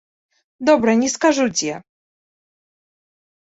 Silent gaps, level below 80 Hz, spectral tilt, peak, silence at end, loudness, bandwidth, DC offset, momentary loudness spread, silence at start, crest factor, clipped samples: none; -60 dBFS; -3.5 dB/octave; -2 dBFS; 1.7 s; -18 LUFS; 8.2 kHz; under 0.1%; 10 LU; 0.6 s; 18 dB; under 0.1%